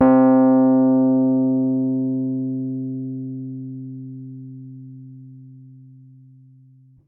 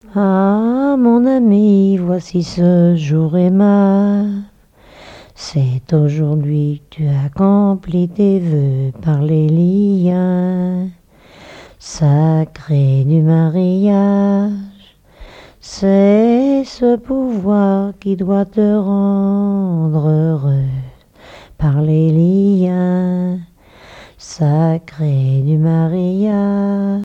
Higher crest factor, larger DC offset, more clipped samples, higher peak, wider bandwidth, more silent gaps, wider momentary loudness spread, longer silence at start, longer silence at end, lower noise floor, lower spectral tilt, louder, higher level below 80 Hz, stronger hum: about the same, 14 dB vs 12 dB; neither; neither; second, -6 dBFS vs 0 dBFS; second, 2.6 kHz vs 8 kHz; neither; first, 24 LU vs 8 LU; about the same, 0 s vs 0.1 s; first, 1.4 s vs 0 s; first, -50 dBFS vs -45 dBFS; first, -14.5 dB/octave vs -9 dB/octave; second, -18 LUFS vs -14 LUFS; second, -66 dBFS vs -44 dBFS; neither